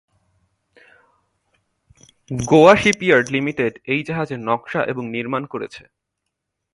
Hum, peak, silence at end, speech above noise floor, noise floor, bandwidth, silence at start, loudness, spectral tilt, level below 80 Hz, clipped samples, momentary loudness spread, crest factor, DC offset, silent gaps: none; 0 dBFS; 0.95 s; 61 dB; -79 dBFS; 11.5 kHz; 2.3 s; -18 LUFS; -5 dB/octave; -52 dBFS; under 0.1%; 17 LU; 20 dB; under 0.1%; none